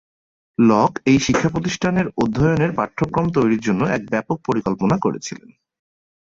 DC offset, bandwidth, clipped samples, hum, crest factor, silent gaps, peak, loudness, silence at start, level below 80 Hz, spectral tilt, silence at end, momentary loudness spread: under 0.1%; 7.8 kHz; under 0.1%; none; 16 dB; none; -2 dBFS; -19 LUFS; 0.6 s; -46 dBFS; -6 dB/octave; 1 s; 7 LU